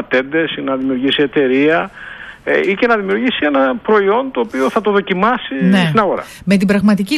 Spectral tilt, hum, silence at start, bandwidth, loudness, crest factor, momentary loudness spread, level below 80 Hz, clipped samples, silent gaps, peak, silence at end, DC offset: -6.5 dB/octave; none; 0 s; 13 kHz; -14 LUFS; 14 dB; 6 LU; -50 dBFS; under 0.1%; none; -2 dBFS; 0 s; under 0.1%